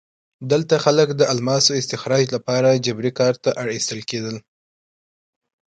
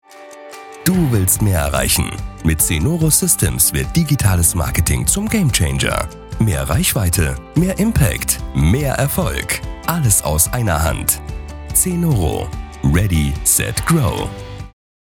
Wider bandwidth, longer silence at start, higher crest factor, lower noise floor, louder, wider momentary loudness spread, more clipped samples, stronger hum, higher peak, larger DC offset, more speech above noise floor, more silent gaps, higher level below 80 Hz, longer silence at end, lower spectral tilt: second, 9.4 kHz vs 19 kHz; first, 0.4 s vs 0.1 s; about the same, 20 dB vs 16 dB; first, under -90 dBFS vs -37 dBFS; second, -19 LUFS vs -16 LUFS; about the same, 10 LU vs 9 LU; neither; neither; about the same, 0 dBFS vs 0 dBFS; neither; first, over 71 dB vs 21 dB; neither; second, -62 dBFS vs -28 dBFS; first, 1.25 s vs 0.4 s; about the same, -4 dB/octave vs -4 dB/octave